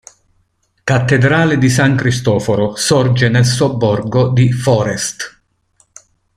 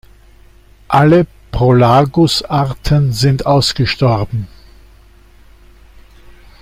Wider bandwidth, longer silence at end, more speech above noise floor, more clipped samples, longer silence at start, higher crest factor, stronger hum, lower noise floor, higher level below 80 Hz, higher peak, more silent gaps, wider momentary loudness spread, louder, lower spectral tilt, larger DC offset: about the same, 14.5 kHz vs 15.5 kHz; second, 1.1 s vs 2.15 s; first, 49 dB vs 32 dB; neither; about the same, 0.85 s vs 0.9 s; about the same, 14 dB vs 14 dB; neither; first, -61 dBFS vs -43 dBFS; second, -44 dBFS vs -34 dBFS; about the same, 0 dBFS vs 0 dBFS; neither; about the same, 7 LU vs 9 LU; about the same, -13 LUFS vs -13 LUFS; about the same, -5.5 dB/octave vs -6.5 dB/octave; neither